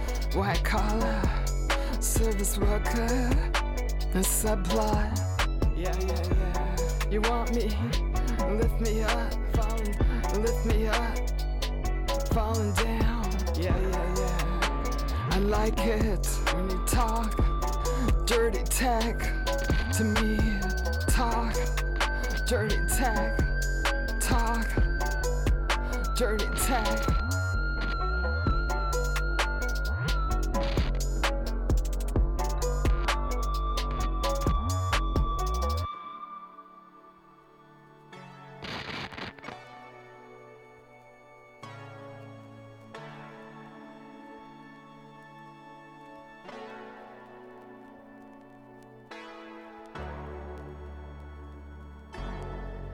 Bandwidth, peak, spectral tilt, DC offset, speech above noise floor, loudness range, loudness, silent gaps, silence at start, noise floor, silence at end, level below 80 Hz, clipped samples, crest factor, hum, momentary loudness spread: 17.5 kHz; -12 dBFS; -4.5 dB/octave; under 0.1%; 30 dB; 19 LU; -29 LUFS; none; 0 s; -56 dBFS; 0 s; -30 dBFS; under 0.1%; 16 dB; none; 20 LU